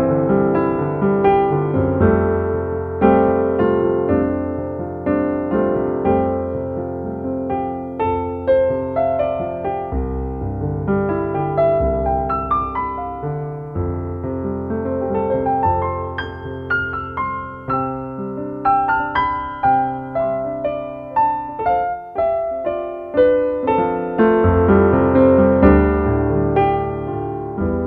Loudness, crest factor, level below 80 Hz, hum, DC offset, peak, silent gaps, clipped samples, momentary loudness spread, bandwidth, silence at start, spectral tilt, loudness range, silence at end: -19 LUFS; 18 dB; -34 dBFS; none; under 0.1%; 0 dBFS; none; under 0.1%; 11 LU; 5.2 kHz; 0 s; -11 dB/octave; 7 LU; 0 s